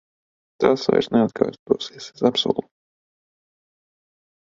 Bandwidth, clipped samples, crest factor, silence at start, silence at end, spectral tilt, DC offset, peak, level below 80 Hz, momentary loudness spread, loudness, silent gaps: 7.6 kHz; under 0.1%; 22 dB; 0.6 s; 1.9 s; -5.5 dB/octave; under 0.1%; -2 dBFS; -60 dBFS; 6 LU; -21 LUFS; 1.59-1.66 s